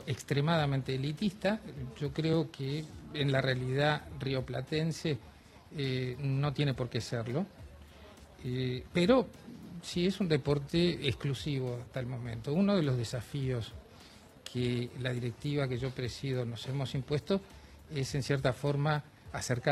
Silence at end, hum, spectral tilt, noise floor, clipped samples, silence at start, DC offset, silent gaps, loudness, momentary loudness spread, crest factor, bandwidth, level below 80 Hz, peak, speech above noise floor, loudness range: 0 s; none; -6.5 dB/octave; -55 dBFS; under 0.1%; 0 s; under 0.1%; none; -33 LUFS; 13 LU; 20 dB; 13.5 kHz; -56 dBFS; -12 dBFS; 23 dB; 4 LU